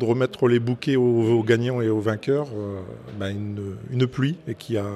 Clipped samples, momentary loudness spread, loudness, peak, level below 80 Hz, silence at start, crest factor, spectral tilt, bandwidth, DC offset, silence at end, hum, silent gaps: under 0.1%; 13 LU; -23 LUFS; -6 dBFS; -60 dBFS; 0 s; 18 dB; -7.5 dB/octave; 12.5 kHz; under 0.1%; 0 s; none; none